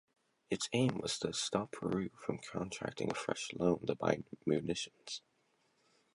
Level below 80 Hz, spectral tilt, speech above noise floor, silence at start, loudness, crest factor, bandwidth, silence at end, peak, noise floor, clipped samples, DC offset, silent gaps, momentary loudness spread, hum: -68 dBFS; -4.5 dB/octave; 39 dB; 0.5 s; -38 LUFS; 22 dB; 11.5 kHz; 0.95 s; -16 dBFS; -76 dBFS; under 0.1%; under 0.1%; none; 8 LU; none